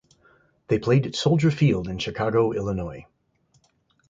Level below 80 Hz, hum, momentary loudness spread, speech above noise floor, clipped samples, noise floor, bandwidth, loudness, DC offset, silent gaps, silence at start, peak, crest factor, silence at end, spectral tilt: -48 dBFS; none; 10 LU; 43 dB; under 0.1%; -66 dBFS; 7.6 kHz; -23 LUFS; under 0.1%; none; 0.7 s; -8 dBFS; 16 dB; 1.1 s; -7 dB/octave